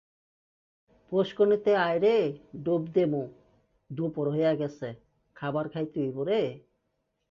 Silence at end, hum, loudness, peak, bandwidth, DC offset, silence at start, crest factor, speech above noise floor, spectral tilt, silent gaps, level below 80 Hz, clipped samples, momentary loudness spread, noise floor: 0.7 s; none; -28 LUFS; -12 dBFS; 7 kHz; under 0.1%; 1.1 s; 16 dB; 51 dB; -8 dB/octave; none; -70 dBFS; under 0.1%; 12 LU; -78 dBFS